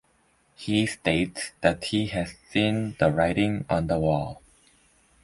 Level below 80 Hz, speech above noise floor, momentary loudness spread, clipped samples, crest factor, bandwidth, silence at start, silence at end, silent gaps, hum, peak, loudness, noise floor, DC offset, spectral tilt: -48 dBFS; 40 dB; 6 LU; under 0.1%; 20 dB; 11.5 kHz; 0.6 s; 0.9 s; none; none; -6 dBFS; -25 LUFS; -65 dBFS; under 0.1%; -5.5 dB/octave